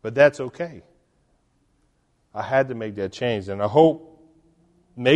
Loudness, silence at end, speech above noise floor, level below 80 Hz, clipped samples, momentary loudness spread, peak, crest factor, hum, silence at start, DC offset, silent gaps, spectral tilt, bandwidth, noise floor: -22 LUFS; 0 s; 45 dB; -62 dBFS; under 0.1%; 16 LU; -2 dBFS; 20 dB; none; 0.05 s; under 0.1%; none; -6.5 dB/octave; 9.4 kHz; -66 dBFS